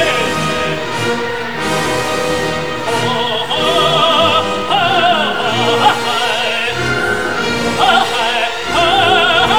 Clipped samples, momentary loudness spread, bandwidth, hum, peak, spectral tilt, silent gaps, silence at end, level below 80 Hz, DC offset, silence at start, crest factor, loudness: under 0.1%; 7 LU; over 20 kHz; none; 0 dBFS; -3.5 dB/octave; none; 0 s; -42 dBFS; 3%; 0 s; 14 dB; -13 LUFS